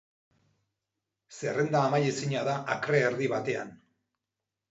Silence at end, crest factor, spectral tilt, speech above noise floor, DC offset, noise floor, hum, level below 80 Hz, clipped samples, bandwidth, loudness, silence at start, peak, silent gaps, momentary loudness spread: 0.95 s; 20 dB; -5.5 dB/octave; 60 dB; under 0.1%; -88 dBFS; none; -74 dBFS; under 0.1%; 8 kHz; -29 LUFS; 1.3 s; -12 dBFS; none; 9 LU